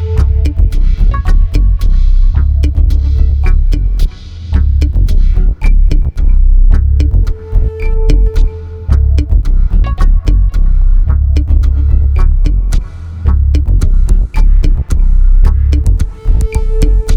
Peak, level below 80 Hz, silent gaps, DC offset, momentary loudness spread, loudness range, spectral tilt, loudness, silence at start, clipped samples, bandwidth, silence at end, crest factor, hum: 0 dBFS; -8 dBFS; none; under 0.1%; 5 LU; 1 LU; -7.5 dB/octave; -13 LUFS; 0 s; 1%; 6.4 kHz; 0 s; 8 dB; none